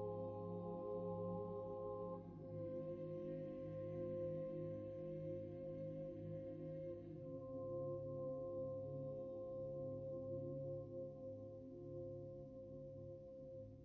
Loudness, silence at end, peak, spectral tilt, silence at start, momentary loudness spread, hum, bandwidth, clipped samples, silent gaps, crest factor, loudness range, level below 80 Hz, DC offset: -50 LUFS; 0 s; -36 dBFS; -10.5 dB/octave; 0 s; 8 LU; none; 4.4 kHz; under 0.1%; none; 12 dB; 2 LU; -70 dBFS; under 0.1%